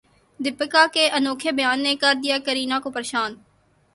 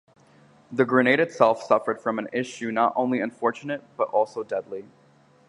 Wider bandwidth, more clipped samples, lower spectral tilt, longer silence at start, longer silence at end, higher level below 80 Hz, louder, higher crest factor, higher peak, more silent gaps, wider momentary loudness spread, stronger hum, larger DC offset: about the same, 11.5 kHz vs 11 kHz; neither; second, -1.5 dB/octave vs -6 dB/octave; second, 0.4 s vs 0.7 s; about the same, 0.6 s vs 0.65 s; first, -66 dBFS vs -74 dBFS; first, -21 LUFS vs -24 LUFS; about the same, 20 dB vs 22 dB; about the same, -2 dBFS vs -4 dBFS; neither; second, 9 LU vs 13 LU; neither; neither